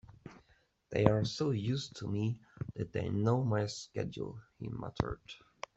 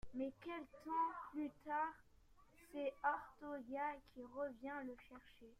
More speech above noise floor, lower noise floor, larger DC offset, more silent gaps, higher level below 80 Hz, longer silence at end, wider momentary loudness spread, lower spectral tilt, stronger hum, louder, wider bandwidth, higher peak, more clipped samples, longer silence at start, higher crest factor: first, 36 dB vs 22 dB; about the same, -70 dBFS vs -69 dBFS; neither; neither; first, -58 dBFS vs -72 dBFS; first, 0.4 s vs 0.05 s; first, 16 LU vs 13 LU; about the same, -6.5 dB/octave vs -6 dB/octave; neither; first, -35 LUFS vs -46 LUFS; second, 8 kHz vs 15.5 kHz; first, -8 dBFS vs -28 dBFS; neither; about the same, 0.1 s vs 0.05 s; first, 28 dB vs 20 dB